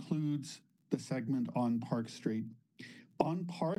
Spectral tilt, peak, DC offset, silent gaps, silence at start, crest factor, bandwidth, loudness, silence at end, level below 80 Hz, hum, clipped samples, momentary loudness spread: -7 dB/octave; -14 dBFS; under 0.1%; none; 0 s; 22 dB; 12.5 kHz; -37 LUFS; 0.05 s; -76 dBFS; none; under 0.1%; 18 LU